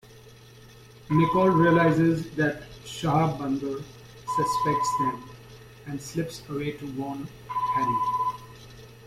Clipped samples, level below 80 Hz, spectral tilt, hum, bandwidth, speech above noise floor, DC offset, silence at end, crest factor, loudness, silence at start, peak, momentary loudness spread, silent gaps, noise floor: under 0.1%; -56 dBFS; -6.5 dB/octave; none; 15 kHz; 25 dB; under 0.1%; 0 s; 18 dB; -25 LUFS; 0.1 s; -8 dBFS; 21 LU; none; -49 dBFS